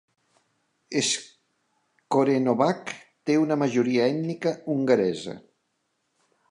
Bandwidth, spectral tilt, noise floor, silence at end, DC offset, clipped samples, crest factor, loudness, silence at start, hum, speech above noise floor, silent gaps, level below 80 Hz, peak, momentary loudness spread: 11.5 kHz; -4.5 dB/octave; -75 dBFS; 1.1 s; under 0.1%; under 0.1%; 18 dB; -25 LUFS; 0.9 s; none; 51 dB; none; -74 dBFS; -8 dBFS; 12 LU